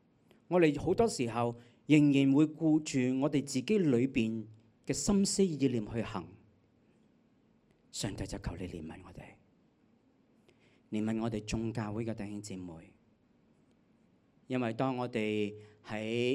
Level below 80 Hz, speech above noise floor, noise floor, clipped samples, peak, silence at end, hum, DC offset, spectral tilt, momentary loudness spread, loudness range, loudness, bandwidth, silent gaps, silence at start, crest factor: -58 dBFS; 37 dB; -68 dBFS; under 0.1%; -10 dBFS; 0 s; none; under 0.1%; -5.5 dB/octave; 17 LU; 15 LU; -32 LUFS; 13.5 kHz; none; 0.5 s; 22 dB